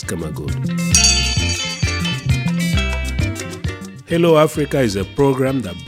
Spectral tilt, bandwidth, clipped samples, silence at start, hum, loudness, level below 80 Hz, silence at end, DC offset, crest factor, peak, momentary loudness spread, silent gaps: -4 dB/octave; 16 kHz; under 0.1%; 0 s; none; -17 LUFS; -28 dBFS; 0 s; under 0.1%; 18 dB; 0 dBFS; 12 LU; none